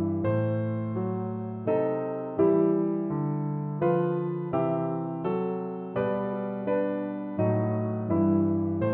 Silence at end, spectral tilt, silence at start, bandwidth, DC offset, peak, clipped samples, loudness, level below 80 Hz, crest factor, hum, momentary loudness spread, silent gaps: 0 s; -13 dB/octave; 0 s; 3.8 kHz; under 0.1%; -12 dBFS; under 0.1%; -28 LUFS; -64 dBFS; 16 dB; none; 7 LU; none